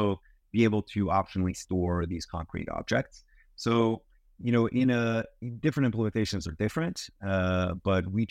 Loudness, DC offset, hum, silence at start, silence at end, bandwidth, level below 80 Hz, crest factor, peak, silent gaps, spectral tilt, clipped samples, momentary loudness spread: -29 LUFS; under 0.1%; none; 0 s; 0.05 s; 13.5 kHz; -50 dBFS; 18 dB; -10 dBFS; none; -6.5 dB/octave; under 0.1%; 10 LU